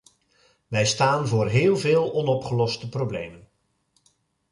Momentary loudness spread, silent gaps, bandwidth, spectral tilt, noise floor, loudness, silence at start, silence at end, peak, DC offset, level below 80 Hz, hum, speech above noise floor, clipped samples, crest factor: 9 LU; none; 11.5 kHz; -5 dB/octave; -69 dBFS; -23 LUFS; 0.7 s; 1.15 s; -8 dBFS; under 0.1%; -56 dBFS; none; 47 dB; under 0.1%; 16 dB